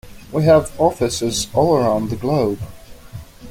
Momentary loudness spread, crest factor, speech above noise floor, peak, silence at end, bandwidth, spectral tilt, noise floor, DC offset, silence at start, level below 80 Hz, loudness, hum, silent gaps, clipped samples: 23 LU; 18 dB; 20 dB; -2 dBFS; 0 s; 16.5 kHz; -5.5 dB/octave; -36 dBFS; under 0.1%; 0.05 s; -42 dBFS; -17 LUFS; none; none; under 0.1%